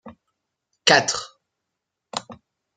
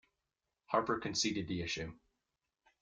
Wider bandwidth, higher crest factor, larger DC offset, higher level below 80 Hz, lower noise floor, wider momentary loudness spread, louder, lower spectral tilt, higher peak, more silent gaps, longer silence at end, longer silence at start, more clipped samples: about the same, 11 kHz vs 10 kHz; about the same, 26 dB vs 22 dB; neither; about the same, -66 dBFS vs -64 dBFS; second, -82 dBFS vs -89 dBFS; first, 17 LU vs 7 LU; first, -19 LUFS vs -36 LUFS; second, -1.5 dB/octave vs -3.5 dB/octave; first, 0 dBFS vs -18 dBFS; neither; second, 0.4 s vs 0.85 s; second, 0.05 s vs 0.7 s; neither